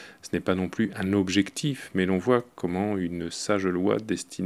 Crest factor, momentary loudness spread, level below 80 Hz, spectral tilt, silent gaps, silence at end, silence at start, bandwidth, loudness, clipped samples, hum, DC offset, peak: 20 dB; 7 LU; -60 dBFS; -5.5 dB/octave; none; 0 s; 0 s; 13.5 kHz; -27 LUFS; under 0.1%; none; under 0.1%; -8 dBFS